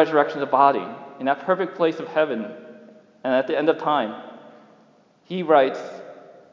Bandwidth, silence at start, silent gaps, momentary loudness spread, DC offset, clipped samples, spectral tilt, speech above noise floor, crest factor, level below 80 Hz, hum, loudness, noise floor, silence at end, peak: 7.4 kHz; 0 s; none; 19 LU; under 0.1%; under 0.1%; -6.5 dB/octave; 35 dB; 20 dB; -88 dBFS; none; -22 LUFS; -56 dBFS; 0.2 s; -2 dBFS